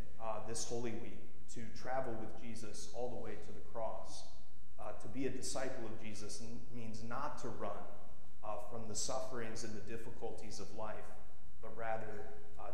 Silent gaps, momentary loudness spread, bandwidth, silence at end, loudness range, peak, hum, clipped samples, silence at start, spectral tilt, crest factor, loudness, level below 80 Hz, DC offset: none; 13 LU; 15.5 kHz; 0 s; 2 LU; -24 dBFS; none; under 0.1%; 0 s; -4 dB/octave; 18 dB; -46 LUFS; -62 dBFS; 3%